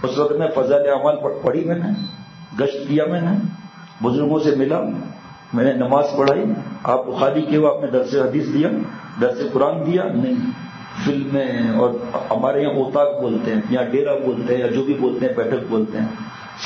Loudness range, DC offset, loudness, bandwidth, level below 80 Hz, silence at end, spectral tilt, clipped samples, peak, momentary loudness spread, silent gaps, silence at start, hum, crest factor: 2 LU; under 0.1%; -19 LUFS; 7.4 kHz; -62 dBFS; 0 s; -7.5 dB/octave; under 0.1%; -2 dBFS; 9 LU; none; 0 s; none; 16 dB